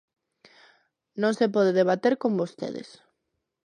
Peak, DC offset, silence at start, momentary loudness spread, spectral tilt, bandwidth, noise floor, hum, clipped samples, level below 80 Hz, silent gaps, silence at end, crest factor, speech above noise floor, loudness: -10 dBFS; under 0.1%; 1.15 s; 14 LU; -6.5 dB/octave; 10.5 kHz; -80 dBFS; none; under 0.1%; -78 dBFS; none; 0.85 s; 18 dB; 56 dB; -25 LUFS